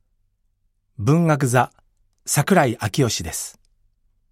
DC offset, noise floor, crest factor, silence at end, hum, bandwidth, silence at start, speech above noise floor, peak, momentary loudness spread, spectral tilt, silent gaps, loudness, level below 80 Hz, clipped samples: under 0.1%; -67 dBFS; 20 dB; 0.8 s; 50 Hz at -50 dBFS; 16 kHz; 1 s; 48 dB; -2 dBFS; 11 LU; -5 dB/octave; none; -20 LUFS; -52 dBFS; under 0.1%